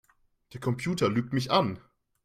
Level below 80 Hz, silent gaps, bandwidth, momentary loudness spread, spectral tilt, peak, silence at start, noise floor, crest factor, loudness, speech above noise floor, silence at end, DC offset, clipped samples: -62 dBFS; none; 15.5 kHz; 14 LU; -6 dB/octave; -10 dBFS; 0.5 s; -63 dBFS; 20 dB; -28 LUFS; 35 dB; 0.45 s; under 0.1%; under 0.1%